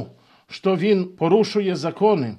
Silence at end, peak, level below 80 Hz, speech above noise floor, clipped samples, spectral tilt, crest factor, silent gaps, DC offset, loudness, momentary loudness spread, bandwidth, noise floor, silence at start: 0 s; -4 dBFS; -68 dBFS; 22 dB; under 0.1%; -7 dB/octave; 16 dB; none; under 0.1%; -20 LUFS; 10 LU; 9.8 kHz; -41 dBFS; 0 s